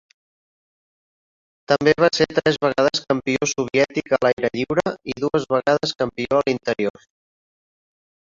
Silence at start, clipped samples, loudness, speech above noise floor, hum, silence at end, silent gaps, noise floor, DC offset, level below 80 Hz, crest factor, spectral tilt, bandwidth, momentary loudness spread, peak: 1.7 s; under 0.1%; -20 LUFS; over 70 dB; none; 1.45 s; 4.33-4.37 s; under -90 dBFS; under 0.1%; -56 dBFS; 20 dB; -4.5 dB/octave; 7.6 kHz; 7 LU; -2 dBFS